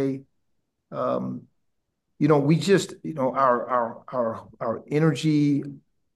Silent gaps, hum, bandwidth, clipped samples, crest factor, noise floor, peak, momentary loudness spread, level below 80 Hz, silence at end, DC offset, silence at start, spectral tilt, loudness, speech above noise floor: none; none; 12.5 kHz; under 0.1%; 20 dB; -78 dBFS; -6 dBFS; 13 LU; -70 dBFS; 0.35 s; under 0.1%; 0 s; -7 dB/octave; -24 LUFS; 54 dB